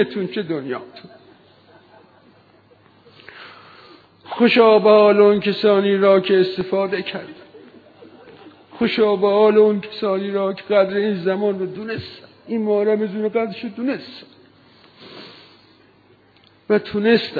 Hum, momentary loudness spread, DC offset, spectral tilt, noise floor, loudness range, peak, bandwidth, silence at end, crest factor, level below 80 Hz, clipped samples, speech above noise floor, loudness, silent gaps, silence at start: none; 20 LU; under 0.1%; -8.5 dB/octave; -53 dBFS; 14 LU; -2 dBFS; 4.9 kHz; 0 s; 18 dB; -64 dBFS; under 0.1%; 36 dB; -18 LUFS; none; 0 s